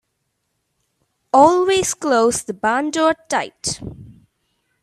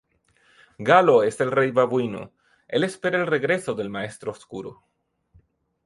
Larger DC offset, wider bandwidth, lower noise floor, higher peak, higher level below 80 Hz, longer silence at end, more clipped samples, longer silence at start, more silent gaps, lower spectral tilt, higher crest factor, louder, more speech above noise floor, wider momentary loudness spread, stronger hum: neither; first, 13.5 kHz vs 11.5 kHz; first, -72 dBFS vs -63 dBFS; about the same, 0 dBFS vs -2 dBFS; first, -52 dBFS vs -64 dBFS; second, 0.7 s vs 1.15 s; neither; first, 1.35 s vs 0.8 s; neither; second, -3 dB/octave vs -5.5 dB/octave; about the same, 20 dB vs 22 dB; first, -17 LUFS vs -22 LUFS; first, 55 dB vs 41 dB; second, 12 LU vs 19 LU; neither